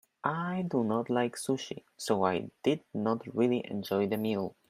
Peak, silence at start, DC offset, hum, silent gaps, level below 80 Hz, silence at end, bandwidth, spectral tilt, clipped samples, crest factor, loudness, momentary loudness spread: -12 dBFS; 0.25 s; under 0.1%; none; none; -74 dBFS; 0.2 s; 15.5 kHz; -6 dB/octave; under 0.1%; 20 dB; -32 LUFS; 5 LU